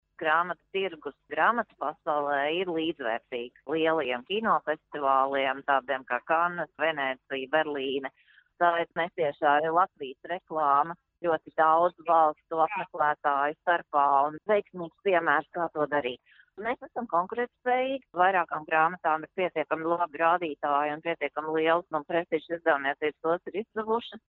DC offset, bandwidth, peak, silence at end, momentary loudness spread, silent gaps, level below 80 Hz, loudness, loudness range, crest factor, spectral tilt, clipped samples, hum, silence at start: under 0.1%; 4.3 kHz; -8 dBFS; 0.1 s; 9 LU; none; -74 dBFS; -28 LUFS; 3 LU; 20 dB; -2 dB/octave; under 0.1%; none; 0.2 s